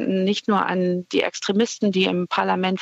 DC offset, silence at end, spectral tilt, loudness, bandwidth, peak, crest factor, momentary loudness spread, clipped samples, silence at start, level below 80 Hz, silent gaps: under 0.1%; 0 s; -5 dB/octave; -21 LUFS; 8 kHz; -6 dBFS; 16 dB; 2 LU; under 0.1%; 0 s; -68 dBFS; none